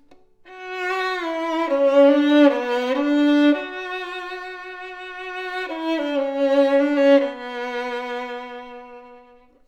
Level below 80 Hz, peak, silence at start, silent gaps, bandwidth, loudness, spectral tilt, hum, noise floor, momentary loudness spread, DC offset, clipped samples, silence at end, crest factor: -64 dBFS; -4 dBFS; 0.45 s; none; 8.2 kHz; -20 LUFS; -3.5 dB/octave; none; -50 dBFS; 18 LU; under 0.1%; under 0.1%; 0.5 s; 16 dB